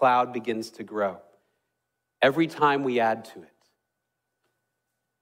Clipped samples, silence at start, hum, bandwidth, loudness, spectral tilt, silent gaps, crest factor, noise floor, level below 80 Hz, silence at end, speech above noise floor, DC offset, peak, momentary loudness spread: under 0.1%; 0 s; none; 16 kHz; -25 LUFS; -5.5 dB/octave; none; 20 dB; -82 dBFS; -74 dBFS; 1.8 s; 57 dB; under 0.1%; -8 dBFS; 12 LU